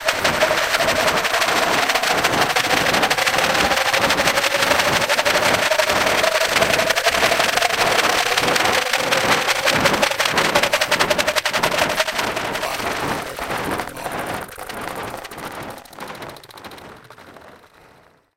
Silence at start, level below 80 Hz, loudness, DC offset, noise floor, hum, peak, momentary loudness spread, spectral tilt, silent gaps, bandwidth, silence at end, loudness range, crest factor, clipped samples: 0 s; -46 dBFS; -17 LUFS; under 0.1%; -52 dBFS; none; -2 dBFS; 15 LU; -2 dB/octave; none; 17 kHz; 0.8 s; 14 LU; 18 dB; under 0.1%